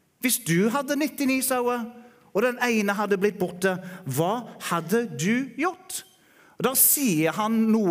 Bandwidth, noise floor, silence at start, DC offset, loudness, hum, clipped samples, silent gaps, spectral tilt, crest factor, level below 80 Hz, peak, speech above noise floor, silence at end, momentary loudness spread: 16 kHz; -56 dBFS; 0.2 s; under 0.1%; -24 LUFS; none; under 0.1%; none; -4 dB/octave; 18 dB; -70 dBFS; -6 dBFS; 32 dB; 0 s; 11 LU